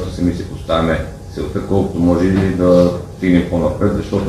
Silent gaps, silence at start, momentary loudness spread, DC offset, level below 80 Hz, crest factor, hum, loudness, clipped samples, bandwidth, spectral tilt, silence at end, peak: none; 0 s; 11 LU; under 0.1%; -32 dBFS; 16 dB; none; -16 LUFS; under 0.1%; 13 kHz; -7.5 dB/octave; 0 s; 0 dBFS